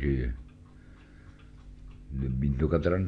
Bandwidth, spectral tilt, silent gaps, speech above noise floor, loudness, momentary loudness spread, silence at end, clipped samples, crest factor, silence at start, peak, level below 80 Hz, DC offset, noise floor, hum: 6.2 kHz; -10 dB/octave; none; 24 dB; -30 LUFS; 26 LU; 0 s; under 0.1%; 20 dB; 0 s; -12 dBFS; -38 dBFS; under 0.1%; -52 dBFS; none